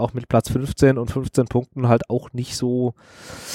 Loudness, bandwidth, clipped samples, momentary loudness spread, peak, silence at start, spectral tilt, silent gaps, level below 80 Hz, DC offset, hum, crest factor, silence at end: -21 LUFS; 16.5 kHz; under 0.1%; 10 LU; -2 dBFS; 0 s; -6.5 dB/octave; none; -42 dBFS; under 0.1%; none; 20 dB; 0 s